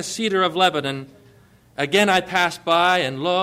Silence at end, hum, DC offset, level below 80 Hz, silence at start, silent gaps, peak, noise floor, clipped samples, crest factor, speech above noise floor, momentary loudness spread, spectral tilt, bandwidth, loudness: 0 s; none; under 0.1%; -60 dBFS; 0 s; none; -6 dBFS; -52 dBFS; under 0.1%; 16 dB; 32 dB; 11 LU; -3.5 dB/octave; 16 kHz; -19 LUFS